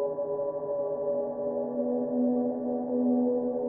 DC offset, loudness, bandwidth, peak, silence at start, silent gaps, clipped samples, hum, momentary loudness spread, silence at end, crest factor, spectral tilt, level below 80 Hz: under 0.1%; -29 LUFS; 1.9 kHz; -16 dBFS; 0 s; none; under 0.1%; none; 5 LU; 0 s; 12 dB; -7.5 dB/octave; -72 dBFS